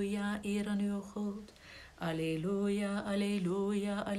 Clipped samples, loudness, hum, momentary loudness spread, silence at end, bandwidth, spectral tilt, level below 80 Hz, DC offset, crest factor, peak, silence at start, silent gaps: under 0.1%; -35 LUFS; none; 10 LU; 0 s; 13.5 kHz; -6.5 dB/octave; -62 dBFS; under 0.1%; 12 dB; -24 dBFS; 0 s; none